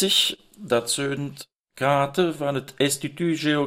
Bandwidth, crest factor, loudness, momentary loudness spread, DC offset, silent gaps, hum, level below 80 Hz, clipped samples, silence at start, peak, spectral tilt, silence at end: 16 kHz; 16 dB; -24 LUFS; 13 LU; under 0.1%; 1.56-1.64 s; none; -64 dBFS; under 0.1%; 0 s; -8 dBFS; -3.5 dB/octave; 0 s